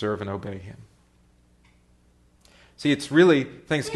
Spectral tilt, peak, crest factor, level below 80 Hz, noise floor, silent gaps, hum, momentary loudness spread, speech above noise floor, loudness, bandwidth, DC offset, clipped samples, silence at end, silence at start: -6 dB/octave; -4 dBFS; 22 dB; -60 dBFS; -60 dBFS; none; 60 Hz at -60 dBFS; 20 LU; 37 dB; -22 LUFS; 12 kHz; under 0.1%; under 0.1%; 0 s; 0 s